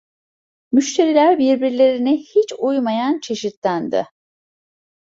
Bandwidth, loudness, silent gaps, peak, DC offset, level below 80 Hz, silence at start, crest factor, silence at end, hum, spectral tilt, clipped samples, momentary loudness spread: 7.8 kHz; -17 LUFS; 3.57-3.62 s; -2 dBFS; under 0.1%; -66 dBFS; 0.7 s; 16 dB; 1 s; none; -4.5 dB/octave; under 0.1%; 9 LU